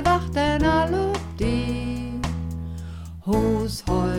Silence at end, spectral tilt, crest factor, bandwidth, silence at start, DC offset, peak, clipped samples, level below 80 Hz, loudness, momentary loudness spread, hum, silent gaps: 0 s; -6.5 dB/octave; 16 dB; 16.5 kHz; 0 s; 0.2%; -8 dBFS; under 0.1%; -34 dBFS; -24 LUFS; 13 LU; none; none